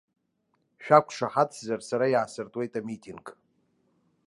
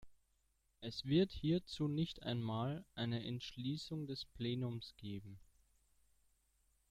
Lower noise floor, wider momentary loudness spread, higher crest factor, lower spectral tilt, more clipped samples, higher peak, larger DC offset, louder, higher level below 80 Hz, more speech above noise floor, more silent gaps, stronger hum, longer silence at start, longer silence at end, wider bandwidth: second, -74 dBFS vs -79 dBFS; first, 20 LU vs 13 LU; about the same, 24 dB vs 20 dB; second, -5.5 dB/octave vs -7 dB/octave; neither; first, -4 dBFS vs -24 dBFS; neither; first, -26 LUFS vs -42 LUFS; second, -76 dBFS vs -66 dBFS; first, 48 dB vs 38 dB; neither; neither; first, 0.8 s vs 0 s; second, 0.95 s vs 1.45 s; second, 11.5 kHz vs 14 kHz